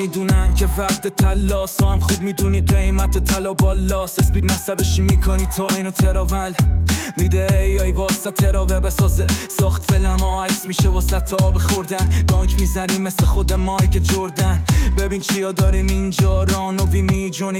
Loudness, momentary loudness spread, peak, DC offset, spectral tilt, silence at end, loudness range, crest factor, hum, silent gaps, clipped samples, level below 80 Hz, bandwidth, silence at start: -18 LUFS; 3 LU; -6 dBFS; under 0.1%; -5.5 dB/octave; 0 s; 0 LU; 10 dB; none; none; under 0.1%; -20 dBFS; 17 kHz; 0 s